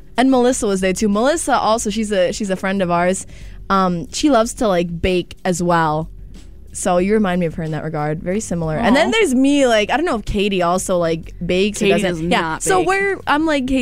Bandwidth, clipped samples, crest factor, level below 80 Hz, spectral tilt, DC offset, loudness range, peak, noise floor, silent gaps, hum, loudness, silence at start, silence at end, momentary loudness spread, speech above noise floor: 16 kHz; under 0.1%; 14 dB; -36 dBFS; -4.5 dB/octave; 1%; 3 LU; -4 dBFS; -37 dBFS; none; none; -17 LUFS; 0.15 s; 0 s; 8 LU; 21 dB